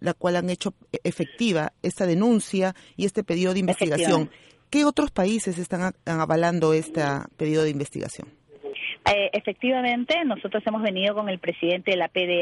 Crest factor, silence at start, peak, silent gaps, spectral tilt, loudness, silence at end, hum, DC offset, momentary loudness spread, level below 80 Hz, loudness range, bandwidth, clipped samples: 18 dB; 0 s; -6 dBFS; none; -5 dB/octave; -24 LUFS; 0 s; none; under 0.1%; 9 LU; -56 dBFS; 2 LU; 11.5 kHz; under 0.1%